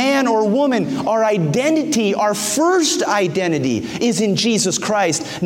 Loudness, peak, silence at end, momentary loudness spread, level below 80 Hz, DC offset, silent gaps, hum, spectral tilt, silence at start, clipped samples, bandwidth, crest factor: -17 LUFS; -4 dBFS; 0 s; 4 LU; -58 dBFS; under 0.1%; none; none; -4 dB/octave; 0 s; under 0.1%; 16.5 kHz; 14 dB